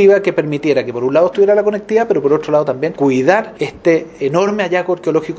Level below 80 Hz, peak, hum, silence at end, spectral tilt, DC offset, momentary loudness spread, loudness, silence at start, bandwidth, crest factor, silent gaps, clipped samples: -54 dBFS; 0 dBFS; none; 0 s; -6.5 dB/octave; under 0.1%; 5 LU; -15 LUFS; 0 s; 8 kHz; 14 dB; none; under 0.1%